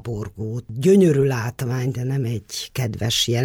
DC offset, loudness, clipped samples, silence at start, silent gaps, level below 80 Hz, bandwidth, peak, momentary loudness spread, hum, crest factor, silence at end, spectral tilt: under 0.1%; -21 LUFS; under 0.1%; 0.05 s; none; -50 dBFS; 18 kHz; -6 dBFS; 14 LU; none; 14 dB; 0 s; -5.5 dB/octave